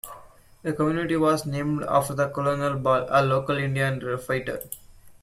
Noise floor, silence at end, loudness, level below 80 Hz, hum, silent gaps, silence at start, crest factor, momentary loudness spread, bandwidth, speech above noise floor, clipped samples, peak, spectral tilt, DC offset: -49 dBFS; 0.1 s; -25 LUFS; -54 dBFS; none; none; 0.05 s; 18 dB; 12 LU; 16 kHz; 25 dB; under 0.1%; -8 dBFS; -6 dB/octave; under 0.1%